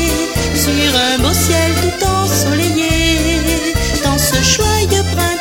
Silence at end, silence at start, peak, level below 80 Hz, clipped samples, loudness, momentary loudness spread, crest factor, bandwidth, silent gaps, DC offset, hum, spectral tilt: 0 s; 0 s; 0 dBFS; -24 dBFS; under 0.1%; -13 LUFS; 4 LU; 14 dB; 17 kHz; none; under 0.1%; none; -3.5 dB/octave